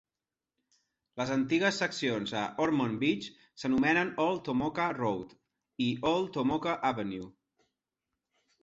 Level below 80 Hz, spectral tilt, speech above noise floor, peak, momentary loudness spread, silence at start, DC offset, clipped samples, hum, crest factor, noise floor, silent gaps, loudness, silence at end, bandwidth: -66 dBFS; -5.5 dB/octave; over 60 dB; -14 dBFS; 11 LU; 1.15 s; under 0.1%; under 0.1%; none; 18 dB; under -90 dBFS; none; -31 LUFS; 1.3 s; 8 kHz